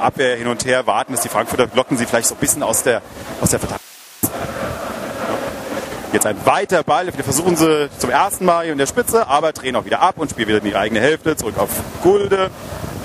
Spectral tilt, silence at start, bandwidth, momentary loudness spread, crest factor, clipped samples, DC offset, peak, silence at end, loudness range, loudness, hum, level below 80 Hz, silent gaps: -3.5 dB/octave; 0 s; 16 kHz; 9 LU; 18 dB; under 0.1%; under 0.1%; 0 dBFS; 0 s; 5 LU; -17 LUFS; none; -44 dBFS; none